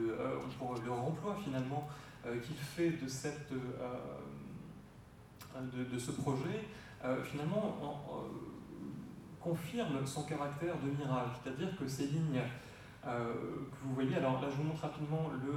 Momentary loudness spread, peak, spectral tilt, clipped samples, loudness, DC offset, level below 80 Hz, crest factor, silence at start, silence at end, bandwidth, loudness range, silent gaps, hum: 13 LU; -22 dBFS; -6.5 dB/octave; under 0.1%; -40 LUFS; under 0.1%; -66 dBFS; 18 dB; 0 s; 0 s; 16.5 kHz; 4 LU; none; none